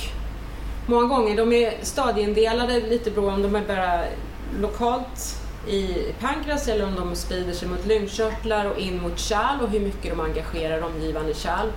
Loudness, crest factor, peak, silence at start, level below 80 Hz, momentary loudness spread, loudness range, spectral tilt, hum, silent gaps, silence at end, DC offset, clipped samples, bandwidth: -24 LUFS; 14 dB; -8 dBFS; 0 s; -34 dBFS; 11 LU; 5 LU; -4.5 dB/octave; none; none; 0 s; under 0.1%; under 0.1%; 16.5 kHz